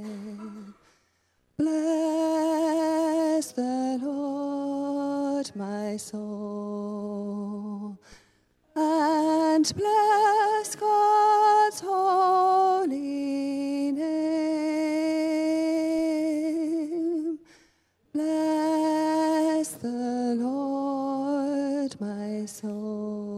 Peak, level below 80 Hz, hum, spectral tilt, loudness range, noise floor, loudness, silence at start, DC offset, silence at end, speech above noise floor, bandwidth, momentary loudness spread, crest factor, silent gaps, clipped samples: -12 dBFS; -70 dBFS; none; -4.5 dB/octave; 9 LU; -70 dBFS; -26 LUFS; 0 s; under 0.1%; 0 s; 40 dB; 13.5 kHz; 13 LU; 14 dB; none; under 0.1%